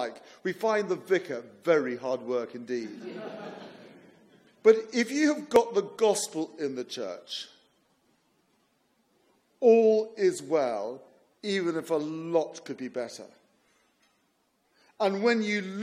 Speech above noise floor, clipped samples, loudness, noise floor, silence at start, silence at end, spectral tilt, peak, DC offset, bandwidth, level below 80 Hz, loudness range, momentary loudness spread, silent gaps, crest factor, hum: 44 dB; under 0.1%; -28 LUFS; -72 dBFS; 0 s; 0 s; -4.5 dB/octave; -6 dBFS; under 0.1%; 14.5 kHz; -76 dBFS; 7 LU; 17 LU; none; 22 dB; none